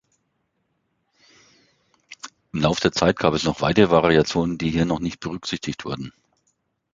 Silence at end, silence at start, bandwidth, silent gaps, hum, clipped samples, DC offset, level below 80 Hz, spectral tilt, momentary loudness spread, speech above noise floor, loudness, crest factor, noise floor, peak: 0.85 s; 2.1 s; 8.6 kHz; none; none; under 0.1%; under 0.1%; -46 dBFS; -5.5 dB/octave; 16 LU; 52 dB; -21 LUFS; 22 dB; -72 dBFS; -2 dBFS